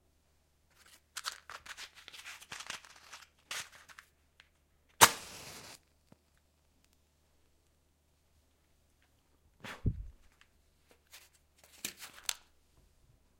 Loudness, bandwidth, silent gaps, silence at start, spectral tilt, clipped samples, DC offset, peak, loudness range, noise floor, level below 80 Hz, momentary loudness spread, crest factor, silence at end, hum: -33 LUFS; 16.5 kHz; none; 1.15 s; -1.5 dB/octave; under 0.1%; under 0.1%; -2 dBFS; 15 LU; -72 dBFS; -58 dBFS; 29 LU; 38 dB; 1.05 s; none